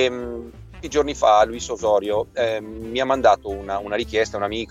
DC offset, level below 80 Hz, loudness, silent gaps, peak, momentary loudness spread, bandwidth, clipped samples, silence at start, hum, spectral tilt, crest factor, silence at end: under 0.1%; -44 dBFS; -21 LUFS; none; -4 dBFS; 13 LU; 14 kHz; under 0.1%; 0 s; none; -4 dB/octave; 18 dB; 0 s